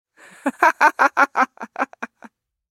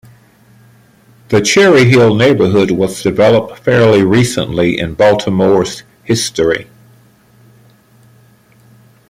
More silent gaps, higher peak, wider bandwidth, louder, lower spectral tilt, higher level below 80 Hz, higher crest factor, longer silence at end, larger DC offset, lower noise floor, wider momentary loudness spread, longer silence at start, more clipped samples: neither; about the same, 0 dBFS vs 0 dBFS; about the same, 16.5 kHz vs 16 kHz; second, -19 LUFS vs -11 LUFS; second, -2 dB/octave vs -5.5 dB/octave; second, -80 dBFS vs -44 dBFS; first, 20 dB vs 12 dB; second, 0.65 s vs 2.45 s; neither; about the same, -48 dBFS vs -46 dBFS; first, 14 LU vs 8 LU; second, 0.45 s vs 1.3 s; neither